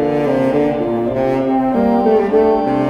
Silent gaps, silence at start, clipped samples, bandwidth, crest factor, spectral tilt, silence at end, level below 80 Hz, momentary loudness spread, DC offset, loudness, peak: none; 0 s; under 0.1%; 9 kHz; 12 dB; -8.5 dB/octave; 0 s; -42 dBFS; 4 LU; under 0.1%; -15 LUFS; -2 dBFS